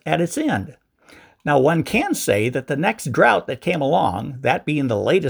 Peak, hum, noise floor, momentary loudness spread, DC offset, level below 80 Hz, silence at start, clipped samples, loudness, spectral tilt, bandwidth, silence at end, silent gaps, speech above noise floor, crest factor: 0 dBFS; none; -50 dBFS; 7 LU; under 0.1%; -54 dBFS; 0.05 s; under 0.1%; -20 LUFS; -5.5 dB/octave; over 20 kHz; 0 s; none; 30 dB; 18 dB